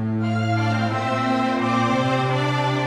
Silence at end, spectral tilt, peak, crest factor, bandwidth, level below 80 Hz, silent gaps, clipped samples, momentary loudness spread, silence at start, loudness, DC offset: 0 s; -6.5 dB/octave; -8 dBFS; 12 dB; 11 kHz; -56 dBFS; none; under 0.1%; 2 LU; 0 s; -21 LUFS; under 0.1%